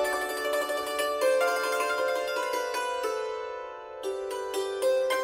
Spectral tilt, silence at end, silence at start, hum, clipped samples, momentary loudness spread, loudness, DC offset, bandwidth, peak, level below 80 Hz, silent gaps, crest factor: -0.5 dB/octave; 0 s; 0 s; none; under 0.1%; 10 LU; -29 LUFS; under 0.1%; 16 kHz; -14 dBFS; -66 dBFS; none; 16 dB